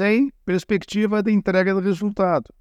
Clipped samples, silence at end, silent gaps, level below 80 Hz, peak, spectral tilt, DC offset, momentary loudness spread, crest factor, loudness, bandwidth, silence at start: under 0.1%; 0.2 s; none; -52 dBFS; -4 dBFS; -7 dB/octave; under 0.1%; 4 LU; 16 dB; -21 LUFS; 9 kHz; 0 s